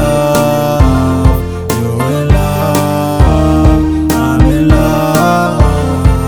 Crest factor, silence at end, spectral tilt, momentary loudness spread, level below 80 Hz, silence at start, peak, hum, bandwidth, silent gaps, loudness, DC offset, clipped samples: 10 dB; 0 s; -7 dB/octave; 4 LU; -16 dBFS; 0 s; 0 dBFS; none; over 20 kHz; none; -11 LUFS; 1%; 2%